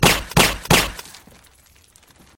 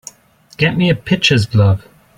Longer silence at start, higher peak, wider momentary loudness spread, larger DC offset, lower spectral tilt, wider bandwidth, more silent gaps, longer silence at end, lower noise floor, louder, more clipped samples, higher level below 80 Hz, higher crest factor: second, 0 s vs 0.6 s; about the same, 0 dBFS vs 0 dBFS; first, 13 LU vs 5 LU; neither; second, -3 dB/octave vs -5.5 dB/octave; first, 17 kHz vs 11.5 kHz; neither; first, 1.35 s vs 0.4 s; first, -52 dBFS vs -40 dBFS; about the same, -16 LUFS vs -14 LUFS; neither; first, -34 dBFS vs -44 dBFS; first, 20 dB vs 14 dB